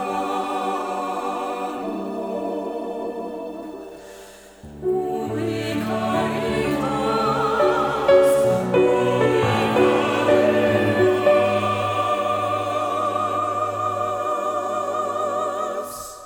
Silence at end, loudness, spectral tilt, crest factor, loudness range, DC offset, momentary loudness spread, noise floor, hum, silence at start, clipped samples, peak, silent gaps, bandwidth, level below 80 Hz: 0 s; -21 LUFS; -5.5 dB/octave; 16 dB; 11 LU; under 0.1%; 12 LU; -43 dBFS; none; 0 s; under 0.1%; -4 dBFS; none; 19.5 kHz; -52 dBFS